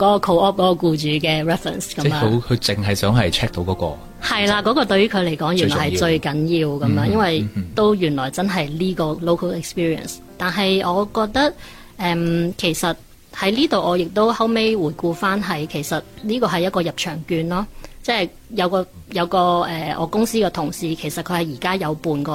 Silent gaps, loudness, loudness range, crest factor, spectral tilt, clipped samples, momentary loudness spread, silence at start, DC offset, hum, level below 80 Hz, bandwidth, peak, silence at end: none; -20 LUFS; 3 LU; 14 dB; -5.5 dB/octave; under 0.1%; 8 LU; 0 s; under 0.1%; none; -44 dBFS; 16.5 kHz; -4 dBFS; 0 s